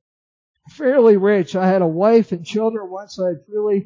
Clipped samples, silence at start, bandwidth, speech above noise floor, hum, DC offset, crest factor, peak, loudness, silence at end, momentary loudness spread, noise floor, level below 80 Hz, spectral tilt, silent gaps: under 0.1%; 0.8 s; 7.6 kHz; over 74 dB; none; under 0.1%; 16 dB; -2 dBFS; -17 LUFS; 0 s; 11 LU; under -90 dBFS; -68 dBFS; -7.5 dB/octave; none